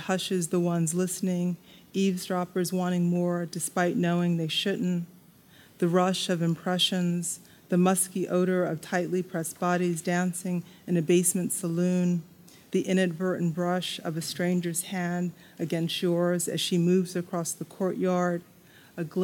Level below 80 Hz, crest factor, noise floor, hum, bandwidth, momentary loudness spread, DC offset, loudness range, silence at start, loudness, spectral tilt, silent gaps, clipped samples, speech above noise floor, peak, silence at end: -74 dBFS; 16 dB; -55 dBFS; none; 17 kHz; 8 LU; under 0.1%; 2 LU; 0 s; -28 LUFS; -5 dB/octave; none; under 0.1%; 28 dB; -10 dBFS; 0 s